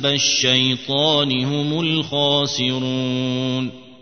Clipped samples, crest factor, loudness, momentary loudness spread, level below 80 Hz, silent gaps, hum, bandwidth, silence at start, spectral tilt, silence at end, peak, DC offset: under 0.1%; 18 dB; -18 LUFS; 7 LU; -60 dBFS; none; none; 6.6 kHz; 0 s; -4 dB/octave; 0.05 s; -2 dBFS; 0.3%